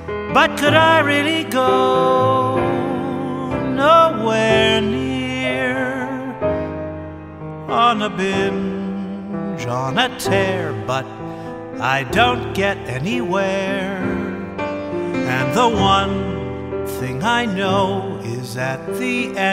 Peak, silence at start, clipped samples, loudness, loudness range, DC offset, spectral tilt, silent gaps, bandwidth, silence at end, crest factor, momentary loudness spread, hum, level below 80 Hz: 0 dBFS; 0 s; under 0.1%; -18 LUFS; 5 LU; under 0.1%; -5 dB/octave; none; 16 kHz; 0 s; 18 dB; 12 LU; none; -44 dBFS